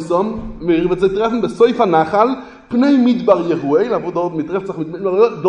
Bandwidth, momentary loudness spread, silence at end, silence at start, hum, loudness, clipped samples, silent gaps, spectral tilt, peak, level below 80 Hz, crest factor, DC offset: 10 kHz; 9 LU; 0 s; 0 s; none; -16 LUFS; under 0.1%; none; -7.5 dB/octave; 0 dBFS; -44 dBFS; 16 dB; under 0.1%